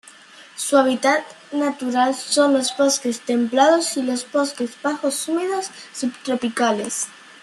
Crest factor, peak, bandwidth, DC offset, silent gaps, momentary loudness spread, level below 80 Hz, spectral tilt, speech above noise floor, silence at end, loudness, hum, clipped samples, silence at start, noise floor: 18 dB; -4 dBFS; 13 kHz; under 0.1%; none; 11 LU; -72 dBFS; -2 dB/octave; 25 dB; 0.25 s; -20 LUFS; none; under 0.1%; 0.35 s; -45 dBFS